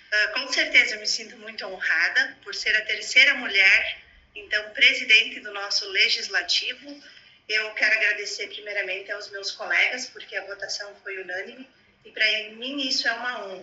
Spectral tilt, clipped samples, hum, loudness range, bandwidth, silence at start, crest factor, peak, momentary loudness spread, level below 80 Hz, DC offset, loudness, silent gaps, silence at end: 1 dB/octave; under 0.1%; none; 9 LU; 8.2 kHz; 0.1 s; 22 dB; -2 dBFS; 17 LU; -66 dBFS; under 0.1%; -22 LUFS; none; 0 s